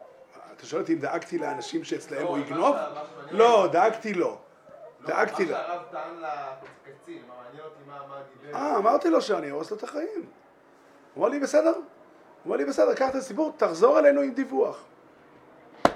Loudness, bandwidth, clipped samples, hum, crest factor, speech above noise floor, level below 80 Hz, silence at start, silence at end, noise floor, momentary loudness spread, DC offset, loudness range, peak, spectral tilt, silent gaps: -25 LUFS; 12.5 kHz; under 0.1%; none; 24 dB; 30 dB; -70 dBFS; 0.35 s; 0 s; -56 dBFS; 23 LU; under 0.1%; 8 LU; -2 dBFS; -5 dB/octave; none